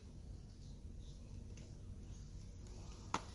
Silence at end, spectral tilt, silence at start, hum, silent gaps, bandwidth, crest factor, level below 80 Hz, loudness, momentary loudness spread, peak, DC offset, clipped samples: 0 s; -4.5 dB/octave; 0 s; none; none; 11.5 kHz; 30 dB; -56 dBFS; -53 LUFS; 6 LU; -20 dBFS; under 0.1%; under 0.1%